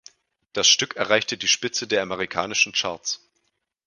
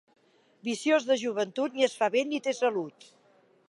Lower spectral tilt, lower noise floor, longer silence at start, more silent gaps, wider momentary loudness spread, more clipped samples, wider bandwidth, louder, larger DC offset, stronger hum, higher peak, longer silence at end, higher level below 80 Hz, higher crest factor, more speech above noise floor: second, -0.5 dB/octave vs -3.5 dB/octave; first, -73 dBFS vs -63 dBFS; about the same, 0.55 s vs 0.65 s; neither; about the same, 12 LU vs 10 LU; neither; about the same, 11 kHz vs 11.5 kHz; first, -21 LUFS vs -28 LUFS; neither; neither; first, 0 dBFS vs -10 dBFS; about the same, 0.7 s vs 0.8 s; first, -64 dBFS vs -86 dBFS; first, 24 dB vs 18 dB; first, 50 dB vs 35 dB